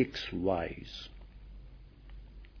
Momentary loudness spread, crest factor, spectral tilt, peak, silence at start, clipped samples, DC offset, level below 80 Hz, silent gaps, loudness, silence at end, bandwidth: 22 LU; 22 dB; -4 dB/octave; -16 dBFS; 0 s; under 0.1%; under 0.1%; -50 dBFS; none; -35 LUFS; 0 s; 5.4 kHz